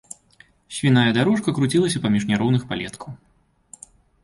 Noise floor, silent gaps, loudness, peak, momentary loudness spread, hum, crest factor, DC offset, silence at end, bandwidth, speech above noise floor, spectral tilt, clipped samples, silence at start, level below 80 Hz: -55 dBFS; none; -20 LUFS; -4 dBFS; 21 LU; none; 18 dB; under 0.1%; 1.1 s; 11.5 kHz; 35 dB; -5.5 dB/octave; under 0.1%; 0.7 s; -54 dBFS